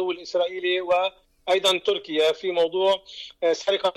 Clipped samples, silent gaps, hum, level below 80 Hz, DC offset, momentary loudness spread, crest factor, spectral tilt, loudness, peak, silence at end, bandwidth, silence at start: under 0.1%; none; none; -66 dBFS; under 0.1%; 6 LU; 12 dB; -2.5 dB/octave; -23 LUFS; -12 dBFS; 0.05 s; 15.5 kHz; 0 s